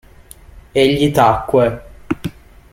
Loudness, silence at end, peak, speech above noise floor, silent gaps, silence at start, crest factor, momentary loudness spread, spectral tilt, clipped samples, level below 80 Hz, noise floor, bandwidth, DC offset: -15 LUFS; 0.4 s; -2 dBFS; 28 dB; none; 0.55 s; 16 dB; 14 LU; -6 dB/octave; under 0.1%; -40 dBFS; -41 dBFS; 16.5 kHz; under 0.1%